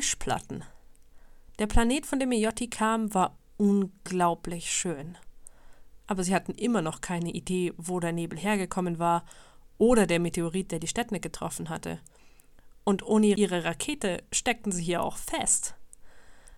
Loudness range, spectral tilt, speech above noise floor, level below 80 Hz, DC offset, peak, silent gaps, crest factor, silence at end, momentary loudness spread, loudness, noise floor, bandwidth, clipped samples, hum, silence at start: 4 LU; -4.5 dB/octave; 26 dB; -42 dBFS; under 0.1%; -10 dBFS; none; 20 dB; 0 s; 10 LU; -28 LUFS; -54 dBFS; 16 kHz; under 0.1%; none; 0 s